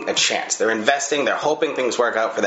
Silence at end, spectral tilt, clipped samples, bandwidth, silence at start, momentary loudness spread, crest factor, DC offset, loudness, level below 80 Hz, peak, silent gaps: 0 s; -1.5 dB/octave; under 0.1%; 8.2 kHz; 0 s; 3 LU; 20 dB; under 0.1%; -20 LUFS; -72 dBFS; 0 dBFS; none